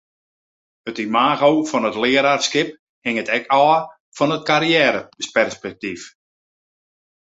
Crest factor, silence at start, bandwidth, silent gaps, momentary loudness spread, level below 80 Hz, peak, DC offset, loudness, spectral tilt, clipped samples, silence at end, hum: 18 dB; 0.85 s; 8 kHz; 2.79-3.02 s, 4.00-4.12 s; 14 LU; -64 dBFS; -2 dBFS; under 0.1%; -18 LUFS; -3.5 dB/octave; under 0.1%; 1.3 s; none